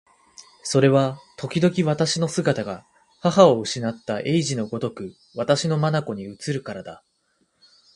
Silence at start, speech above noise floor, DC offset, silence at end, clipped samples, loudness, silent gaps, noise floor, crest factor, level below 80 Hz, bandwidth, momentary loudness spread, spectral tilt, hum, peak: 0.4 s; 46 dB; under 0.1%; 1 s; under 0.1%; -22 LUFS; none; -68 dBFS; 22 dB; -62 dBFS; 11.5 kHz; 18 LU; -5.5 dB/octave; none; 0 dBFS